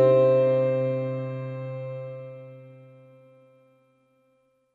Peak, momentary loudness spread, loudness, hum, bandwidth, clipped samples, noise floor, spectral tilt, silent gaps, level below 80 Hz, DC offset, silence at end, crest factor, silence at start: -8 dBFS; 24 LU; -25 LUFS; none; 4.5 kHz; under 0.1%; -67 dBFS; -10 dB/octave; none; -76 dBFS; under 0.1%; 2 s; 18 dB; 0 s